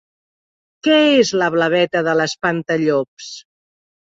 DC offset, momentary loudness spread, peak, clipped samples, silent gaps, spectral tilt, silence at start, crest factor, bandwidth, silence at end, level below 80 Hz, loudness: under 0.1%; 17 LU; -2 dBFS; under 0.1%; 3.08-3.17 s; -4.5 dB/octave; 0.85 s; 16 dB; 8 kHz; 0.75 s; -62 dBFS; -16 LUFS